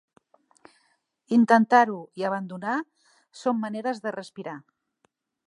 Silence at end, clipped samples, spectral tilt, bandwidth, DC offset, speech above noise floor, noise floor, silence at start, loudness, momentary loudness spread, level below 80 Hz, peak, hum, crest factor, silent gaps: 0.9 s; under 0.1%; -6 dB/octave; 10.5 kHz; under 0.1%; 47 dB; -71 dBFS; 1.3 s; -24 LUFS; 20 LU; -82 dBFS; -4 dBFS; none; 22 dB; none